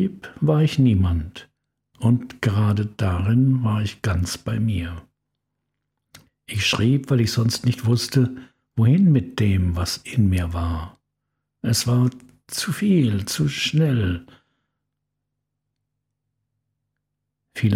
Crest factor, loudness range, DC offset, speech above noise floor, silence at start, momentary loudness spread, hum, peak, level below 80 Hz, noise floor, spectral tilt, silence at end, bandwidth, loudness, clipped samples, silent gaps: 16 dB; 6 LU; under 0.1%; 60 dB; 0 s; 10 LU; 50 Hz at -45 dBFS; -6 dBFS; -42 dBFS; -79 dBFS; -6 dB/octave; 0 s; 16 kHz; -21 LUFS; under 0.1%; none